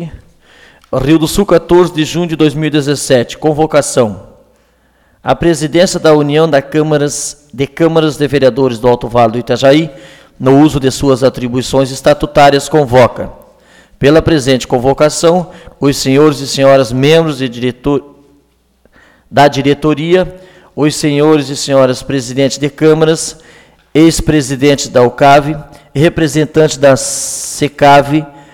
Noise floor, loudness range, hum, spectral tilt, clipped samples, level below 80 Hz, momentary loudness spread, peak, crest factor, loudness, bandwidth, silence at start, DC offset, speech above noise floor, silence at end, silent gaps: -52 dBFS; 3 LU; none; -5 dB/octave; under 0.1%; -34 dBFS; 8 LU; 0 dBFS; 10 dB; -10 LUFS; 17.5 kHz; 0 s; under 0.1%; 42 dB; 0.25 s; none